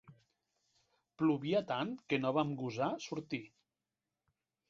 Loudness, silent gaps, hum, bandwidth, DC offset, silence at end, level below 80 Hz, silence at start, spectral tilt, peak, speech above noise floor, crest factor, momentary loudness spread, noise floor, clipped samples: -36 LUFS; none; none; 7.4 kHz; under 0.1%; 1.25 s; -78 dBFS; 0.1 s; -5 dB/octave; -18 dBFS; over 54 dB; 20 dB; 9 LU; under -90 dBFS; under 0.1%